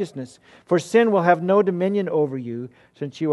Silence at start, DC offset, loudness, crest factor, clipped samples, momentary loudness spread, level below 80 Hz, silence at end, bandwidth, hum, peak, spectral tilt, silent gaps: 0 s; under 0.1%; -20 LUFS; 18 dB; under 0.1%; 17 LU; -70 dBFS; 0 s; 12 kHz; none; -2 dBFS; -7 dB/octave; none